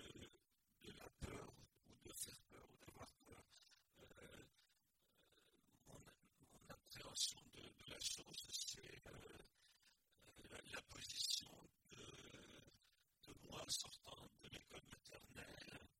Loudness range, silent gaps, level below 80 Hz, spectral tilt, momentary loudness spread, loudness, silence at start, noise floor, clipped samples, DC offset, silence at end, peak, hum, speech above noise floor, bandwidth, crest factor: 17 LU; none; -74 dBFS; -1.5 dB/octave; 21 LU; -52 LUFS; 0 s; -84 dBFS; under 0.1%; under 0.1%; 0.05 s; -28 dBFS; none; 32 dB; 16.5 kHz; 28 dB